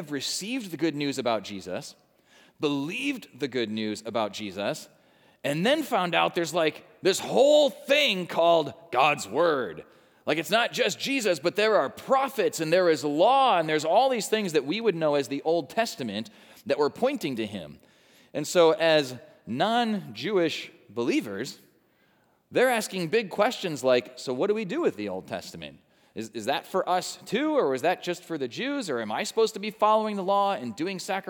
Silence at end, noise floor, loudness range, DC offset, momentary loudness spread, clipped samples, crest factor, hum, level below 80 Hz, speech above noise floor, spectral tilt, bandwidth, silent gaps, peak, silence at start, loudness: 0 s; -66 dBFS; 7 LU; under 0.1%; 13 LU; under 0.1%; 20 dB; none; -78 dBFS; 40 dB; -4 dB/octave; over 20 kHz; none; -8 dBFS; 0 s; -26 LUFS